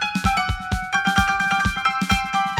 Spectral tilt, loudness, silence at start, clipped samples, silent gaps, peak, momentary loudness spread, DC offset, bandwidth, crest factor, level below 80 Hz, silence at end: -3.5 dB/octave; -20 LUFS; 0 s; under 0.1%; none; -4 dBFS; 4 LU; under 0.1%; over 20 kHz; 16 dB; -34 dBFS; 0 s